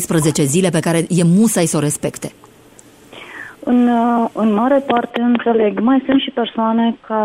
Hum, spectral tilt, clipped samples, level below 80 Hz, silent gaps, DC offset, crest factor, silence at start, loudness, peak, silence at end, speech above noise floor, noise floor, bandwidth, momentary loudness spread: none; -5.5 dB/octave; under 0.1%; -54 dBFS; none; under 0.1%; 14 dB; 0 s; -15 LUFS; -2 dBFS; 0 s; 30 dB; -44 dBFS; 16 kHz; 11 LU